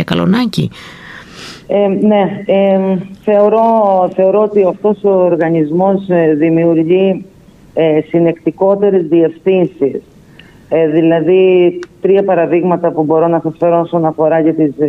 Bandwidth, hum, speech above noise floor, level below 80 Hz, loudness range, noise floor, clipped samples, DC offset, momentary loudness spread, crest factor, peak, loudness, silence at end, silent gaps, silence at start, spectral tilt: 10.5 kHz; none; 29 dB; -52 dBFS; 2 LU; -39 dBFS; under 0.1%; under 0.1%; 8 LU; 10 dB; 0 dBFS; -12 LUFS; 0 s; none; 0 s; -8.5 dB/octave